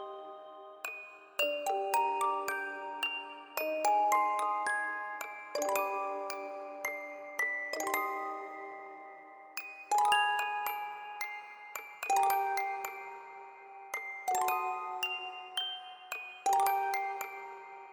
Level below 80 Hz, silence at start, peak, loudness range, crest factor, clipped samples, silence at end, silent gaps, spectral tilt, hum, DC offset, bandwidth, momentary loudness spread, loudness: -86 dBFS; 0 s; -14 dBFS; 4 LU; 20 dB; under 0.1%; 0 s; none; 0.5 dB/octave; none; under 0.1%; over 20 kHz; 16 LU; -34 LUFS